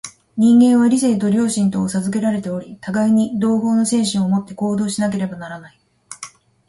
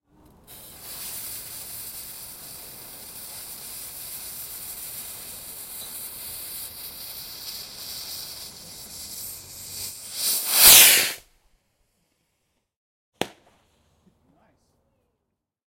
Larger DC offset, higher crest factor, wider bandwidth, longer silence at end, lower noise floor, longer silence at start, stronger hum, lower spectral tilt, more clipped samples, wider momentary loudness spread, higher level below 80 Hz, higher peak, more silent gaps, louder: neither; second, 14 dB vs 28 dB; second, 11.5 kHz vs 16.5 kHz; second, 0.4 s vs 2.4 s; second, -39 dBFS vs -80 dBFS; second, 0.05 s vs 0.5 s; neither; first, -5.5 dB/octave vs 1.5 dB/octave; neither; about the same, 20 LU vs 21 LU; about the same, -56 dBFS vs -58 dBFS; second, -4 dBFS vs 0 dBFS; second, none vs 12.76-13.12 s; about the same, -17 LUFS vs -17 LUFS